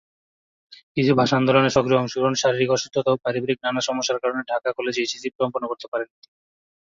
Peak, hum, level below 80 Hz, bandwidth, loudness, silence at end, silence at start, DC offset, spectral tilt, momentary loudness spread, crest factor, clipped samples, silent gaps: -4 dBFS; none; -58 dBFS; 7.8 kHz; -22 LUFS; 0.8 s; 0.7 s; under 0.1%; -4.5 dB/octave; 10 LU; 20 dB; under 0.1%; 0.83-0.95 s, 5.35-5.39 s, 5.88-5.92 s